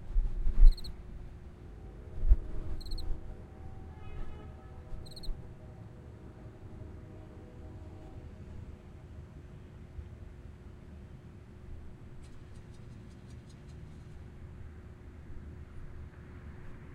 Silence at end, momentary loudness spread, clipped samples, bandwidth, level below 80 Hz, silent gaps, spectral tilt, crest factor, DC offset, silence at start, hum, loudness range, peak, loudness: 0 s; 14 LU; under 0.1%; 4.6 kHz; -34 dBFS; none; -7 dB/octave; 26 dB; under 0.1%; 0 s; none; 11 LU; -8 dBFS; -42 LUFS